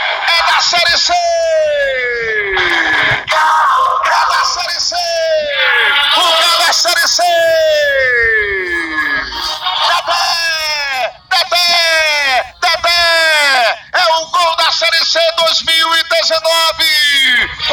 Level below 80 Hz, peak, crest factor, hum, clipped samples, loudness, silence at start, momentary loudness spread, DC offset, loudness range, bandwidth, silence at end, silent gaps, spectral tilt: -44 dBFS; 0 dBFS; 12 dB; none; under 0.1%; -11 LUFS; 0 s; 6 LU; under 0.1%; 3 LU; 17.5 kHz; 0 s; none; 0 dB/octave